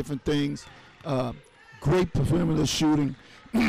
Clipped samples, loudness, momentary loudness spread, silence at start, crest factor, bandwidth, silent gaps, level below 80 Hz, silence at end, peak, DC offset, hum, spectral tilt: under 0.1%; -26 LUFS; 16 LU; 0 s; 8 dB; 15.5 kHz; none; -44 dBFS; 0 s; -18 dBFS; under 0.1%; none; -6 dB/octave